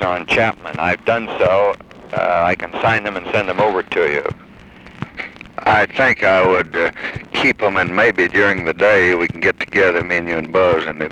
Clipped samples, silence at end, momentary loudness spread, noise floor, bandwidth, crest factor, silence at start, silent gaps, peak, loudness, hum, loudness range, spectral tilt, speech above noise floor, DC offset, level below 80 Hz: under 0.1%; 0 s; 12 LU; -40 dBFS; 10 kHz; 16 dB; 0 s; none; -2 dBFS; -16 LUFS; none; 4 LU; -5.5 dB/octave; 24 dB; under 0.1%; -46 dBFS